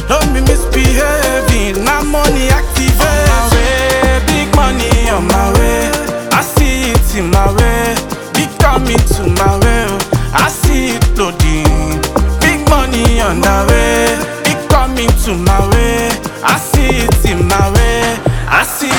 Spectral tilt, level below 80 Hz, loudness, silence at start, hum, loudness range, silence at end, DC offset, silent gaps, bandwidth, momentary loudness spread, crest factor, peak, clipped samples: -4.5 dB/octave; -14 dBFS; -12 LUFS; 0 s; none; 1 LU; 0 s; 0.2%; none; 18.5 kHz; 4 LU; 10 dB; 0 dBFS; under 0.1%